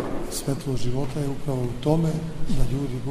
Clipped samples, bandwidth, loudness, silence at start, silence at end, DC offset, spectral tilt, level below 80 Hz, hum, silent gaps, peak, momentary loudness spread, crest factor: under 0.1%; 15.5 kHz; -27 LUFS; 0 s; 0 s; under 0.1%; -6.5 dB/octave; -32 dBFS; none; none; -6 dBFS; 6 LU; 16 dB